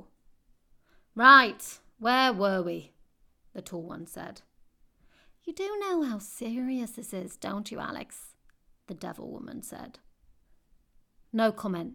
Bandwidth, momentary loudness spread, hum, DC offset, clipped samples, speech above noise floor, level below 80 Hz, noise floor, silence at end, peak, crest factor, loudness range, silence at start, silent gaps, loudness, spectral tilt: 19 kHz; 22 LU; none; under 0.1%; under 0.1%; 35 dB; -66 dBFS; -63 dBFS; 0 s; -4 dBFS; 26 dB; 18 LU; 1.15 s; none; -26 LUFS; -4 dB/octave